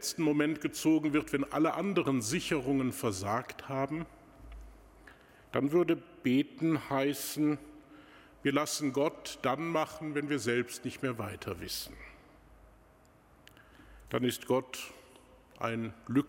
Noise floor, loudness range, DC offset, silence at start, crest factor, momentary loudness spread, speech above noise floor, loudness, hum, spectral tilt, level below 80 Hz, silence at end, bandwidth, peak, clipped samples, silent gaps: -62 dBFS; 7 LU; under 0.1%; 0 s; 20 dB; 11 LU; 30 dB; -33 LUFS; none; -5 dB/octave; -60 dBFS; 0 s; 17 kHz; -14 dBFS; under 0.1%; none